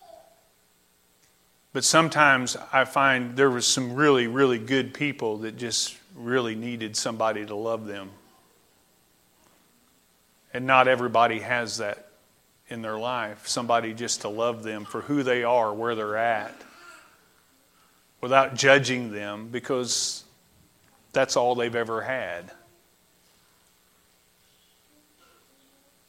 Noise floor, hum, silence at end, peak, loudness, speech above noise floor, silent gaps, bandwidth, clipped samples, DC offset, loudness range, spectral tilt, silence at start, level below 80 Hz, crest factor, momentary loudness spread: -64 dBFS; none; 3.55 s; -2 dBFS; -24 LUFS; 39 dB; none; 16 kHz; under 0.1%; under 0.1%; 9 LU; -3 dB/octave; 1.75 s; -70 dBFS; 24 dB; 15 LU